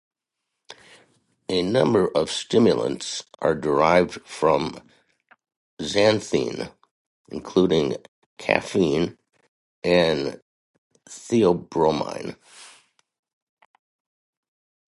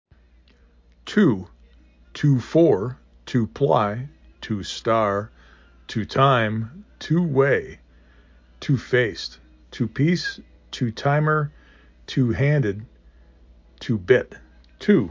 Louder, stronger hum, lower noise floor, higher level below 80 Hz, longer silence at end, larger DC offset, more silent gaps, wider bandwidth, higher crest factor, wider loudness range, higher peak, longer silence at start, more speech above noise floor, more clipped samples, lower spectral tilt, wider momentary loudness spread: about the same, -22 LUFS vs -22 LUFS; neither; first, -82 dBFS vs -55 dBFS; about the same, -54 dBFS vs -50 dBFS; first, 2.2 s vs 0 s; neither; first, 5.56-5.77 s, 6.91-7.25 s, 8.08-8.37 s, 9.48-9.82 s, 10.42-10.90 s vs none; first, 11.5 kHz vs 7.6 kHz; about the same, 24 dB vs 20 dB; about the same, 5 LU vs 3 LU; about the same, -2 dBFS vs -4 dBFS; second, 0.7 s vs 1.05 s; first, 61 dB vs 34 dB; neither; second, -5 dB/octave vs -7 dB/octave; second, 16 LU vs 19 LU